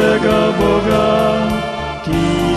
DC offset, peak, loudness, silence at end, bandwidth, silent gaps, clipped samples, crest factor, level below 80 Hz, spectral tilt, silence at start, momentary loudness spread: under 0.1%; -2 dBFS; -15 LUFS; 0 s; 14 kHz; none; under 0.1%; 12 dB; -32 dBFS; -6 dB/octave; 0 s; 7 LU